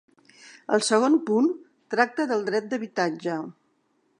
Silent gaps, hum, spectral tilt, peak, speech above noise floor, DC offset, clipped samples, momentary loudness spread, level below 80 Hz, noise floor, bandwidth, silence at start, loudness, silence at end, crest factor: none; none; -4 dB/octave; -4 dBFS; 45 dB; under 0.1%; under 0.1%; 13 LU; -82 dBFS; -69 dBFS; 11 kHz; 0.45 s; -25 LUFS; 0.7 s; 22 dB